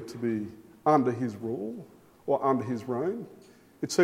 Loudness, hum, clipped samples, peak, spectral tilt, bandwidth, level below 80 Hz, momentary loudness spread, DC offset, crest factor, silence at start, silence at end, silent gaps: -30 LUFS; none; under 0.1%; -10 dBFS; -6 dB/octave; 16 kHz; -72 dBFS; 16 LU; under 0.1%; 20 dB; 0 s; 0 s; none